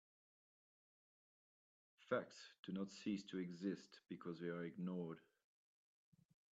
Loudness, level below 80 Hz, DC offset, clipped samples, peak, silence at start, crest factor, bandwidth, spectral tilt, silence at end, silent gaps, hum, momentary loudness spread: -49 LUFS; under -90 dBFS; under 0.1%; under 0.1%; -28 dBFS; 2 s; 24 dB; 8 kHz; -6.5 dB/octave; 1.3 s; 2.59-2.63 s; none; 10 LU